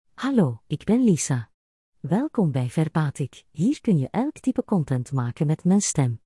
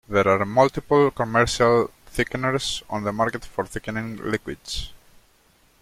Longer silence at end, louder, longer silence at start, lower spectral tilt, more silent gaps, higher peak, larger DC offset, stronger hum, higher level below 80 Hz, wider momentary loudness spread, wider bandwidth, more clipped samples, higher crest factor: second, 0.1 s vs 0.85 s; about the same, -24 LUFS vs -23 LUFS; about the same, 0.2 s vs 0.1 s; first, -6.5 dB/octave vs -5 dB/octave; first, 1.54-1.92 s vs none; second, -8 dBFS vs -4 dBFS; neither; neither; second, -58 dBFS vs -44 dBFS; second, 7 LU vs 12 LU; second, 12 kHz vs 15.5 kHz; neither; about the same, 16 dB vs 20 dB